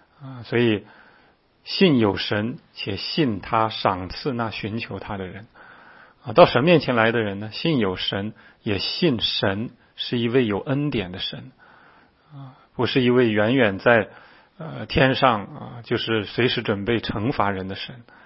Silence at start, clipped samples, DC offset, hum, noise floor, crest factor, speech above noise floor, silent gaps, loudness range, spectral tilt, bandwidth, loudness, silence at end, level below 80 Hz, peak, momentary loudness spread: 0.2 s; under 0.1%; under 0.1%; none; -58 dBFS; 22 dB; 36 dB; none; 5 LU; -9.5 dB/octave; 5.8 kHz; -22 LUFS; 0.25 s; -50 dBFS; 0 dBFS; 17 LU